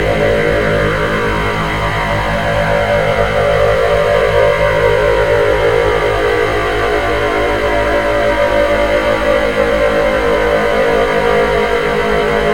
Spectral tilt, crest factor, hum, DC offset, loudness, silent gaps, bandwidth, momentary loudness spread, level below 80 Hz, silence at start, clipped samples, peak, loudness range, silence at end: -5.5 dB/octave; 12 dB; none; under 0.1%; -13 LUFS; none; 16.5 kHz; 3 LU; -26 dBFS; 0 s; under 0.1%; 0 dBFS; 2 LU; 0 s